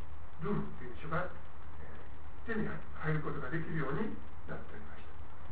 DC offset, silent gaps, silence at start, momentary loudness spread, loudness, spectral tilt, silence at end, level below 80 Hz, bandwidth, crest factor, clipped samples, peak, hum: 3%; none; 0 s; 15 LU; -40 LUFS; -6.5 dB/octave; 0 s; -52 dBFS; 4 kHz; 18 dB; under 0.1%; -20 dBFS; none